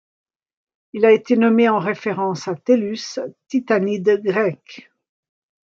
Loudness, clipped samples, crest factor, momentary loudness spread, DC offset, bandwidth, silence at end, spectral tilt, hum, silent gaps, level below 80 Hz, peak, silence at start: -18 LUFS; under 0.1%; 18 dB; 12 LU; under 0.1%; 7.4 kHz; 1 s; -6 dB/octave; none; none; -70 dBFS; -2 dBFS; 0.95 s